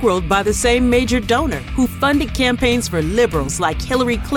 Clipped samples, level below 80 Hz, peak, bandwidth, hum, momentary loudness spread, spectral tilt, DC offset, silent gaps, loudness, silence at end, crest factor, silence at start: under 0.1%; -28 dBFS; -2 dBFS; 17.5 kHz; none; 5 LU; -4.5 dB/octave; under 0.1%; none; -17 LUFS; 0 s; 14 dB; 0 s